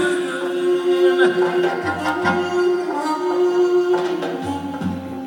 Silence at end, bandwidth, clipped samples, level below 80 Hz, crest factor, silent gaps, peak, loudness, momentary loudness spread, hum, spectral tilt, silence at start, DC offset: 0 s; 17 kHz; under 0.1%; -62 dBFS; 16 dB; none; -4 dBFS; -19 LUFS; 9 LU; none; -5.5 dB/octave; 0 s; under 0.1%